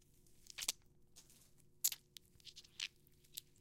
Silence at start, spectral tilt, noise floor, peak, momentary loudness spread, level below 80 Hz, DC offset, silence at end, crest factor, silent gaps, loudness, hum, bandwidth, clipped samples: 0.3 s; 1.5 dB/octave; -67 dBFS; -18 dBFS; 24 LU; -74 dBFS; under 0.1%; 0.2 s; 32 dB; none; -44 LUFS; none; 17 kHz; under 0.1%